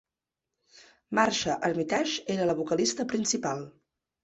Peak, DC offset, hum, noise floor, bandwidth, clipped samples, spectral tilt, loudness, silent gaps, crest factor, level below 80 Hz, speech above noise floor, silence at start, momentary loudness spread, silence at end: -8 dBFS; under 0.1%; none; -88 dBFS; 8.4 kHz; under 0.1%; -3.5 dB/octave; -28 LUFS; none; 22 dB; -66 dBFS; 60 dB; 1.1 s; 6 LU; 0.55 s